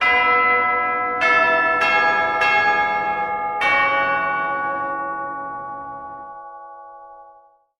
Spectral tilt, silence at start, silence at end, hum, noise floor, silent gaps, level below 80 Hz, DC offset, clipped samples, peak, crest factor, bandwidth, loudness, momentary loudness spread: -3.5 dB/octave; 0 s; 0.5 s; none; -51 dBFS; none; -56 dBFS; under 0.1%; under 0.1%; -4 dBFS; 16 dB; 11.5 kHz; -18 LUFS; 19 LU